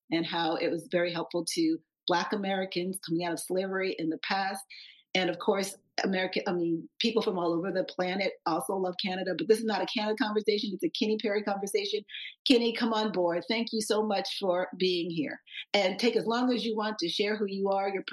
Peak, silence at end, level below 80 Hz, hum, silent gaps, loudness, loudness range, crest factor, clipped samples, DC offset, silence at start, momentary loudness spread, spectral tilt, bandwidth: -10 dBFS; 0 s; -80 dBFS; none; 2.03-2.07 s, 12.39-12.45 s; -30 LUFS; 2 LU; 20 dB; under 0.1%; under 0.1%; 0.1 s; 6 LU; -4.5 dB/octave; 12.5 kHz